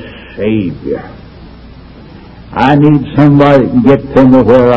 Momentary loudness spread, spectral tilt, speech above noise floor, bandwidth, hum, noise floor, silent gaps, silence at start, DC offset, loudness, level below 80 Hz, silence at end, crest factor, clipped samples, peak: 14 LU; -9.5 dB/octave; 25 dB; 6.6 kHz; none; -32 dBFS; none; 0 s; under 0.1%; -8 LUFS; -34 dBFS; 0 s; 10 dB; 3%; 0 dBFS